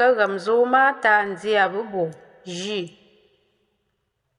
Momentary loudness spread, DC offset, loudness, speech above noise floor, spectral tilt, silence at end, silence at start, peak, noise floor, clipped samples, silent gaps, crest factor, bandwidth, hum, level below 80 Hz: 15 LU; under 0.1%; -21 LUFS; 53 dB; -4 dB/octave; 1.5 s; 0 s; -6 dBFS; -74 dBFS; under 0.1%; none; 16 dB; 10.5 kHz; none; -70 dBFS